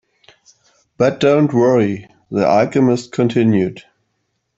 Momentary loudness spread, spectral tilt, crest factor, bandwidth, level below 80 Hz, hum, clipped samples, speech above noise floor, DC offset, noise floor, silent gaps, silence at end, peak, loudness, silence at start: 8 LU; -7.5 dB/octave; 14 dB; 8 kHz; -56 dBFS; none; under 0.1%; 55 dB; under 0.1%; -70 dBFS; none; 0.75 s; -2 dBFS; -15 LUFS; 1 s